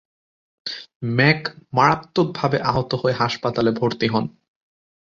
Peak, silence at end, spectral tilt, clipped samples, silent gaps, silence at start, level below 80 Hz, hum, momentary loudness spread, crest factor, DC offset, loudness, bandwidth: -2 dBFS; 0.75 s; -6.5 dB/octave; under 0.1%; 0.95-1.00 s; 0.65 s; -52 dBFS; none; 13 LU; 20 dB; under 0.1%; -20 LUFS; 7.4 kHz